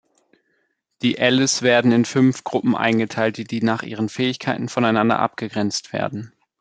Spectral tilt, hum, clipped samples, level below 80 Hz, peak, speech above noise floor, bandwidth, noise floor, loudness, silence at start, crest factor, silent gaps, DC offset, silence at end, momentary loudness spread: -4.5 dB/octave; none; under 0.1%; -64 dBFS; -2 dBFS; 50 dB; 9.4 kHz; -69 dBFS; -20 LUFS; 1.05 s; 18 dB; none; under 0.1%; 0.35 s; 8 LU